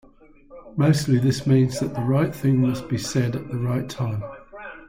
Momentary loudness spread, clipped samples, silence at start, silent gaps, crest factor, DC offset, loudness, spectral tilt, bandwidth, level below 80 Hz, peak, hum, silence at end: 13 LU; under 0.1%; 0.5 s; none; 14 dB; under 0.1%; -22 LUFS; -7 dB/octave; 16 kHz; -50 dBFS; -8 dBFS; none; 0.05 s